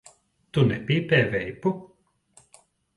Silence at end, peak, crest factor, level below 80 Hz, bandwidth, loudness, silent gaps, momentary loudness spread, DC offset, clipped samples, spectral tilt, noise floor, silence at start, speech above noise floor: 1.1 s; -6 dBFS; 20 dB; -56 dBFS; 11.5 kHz; -24 LUFS; none; 8 LU; under 0.1%; under 0.1%; -7 dB/octave; -60 dBFS; 0.55 s; 36 dB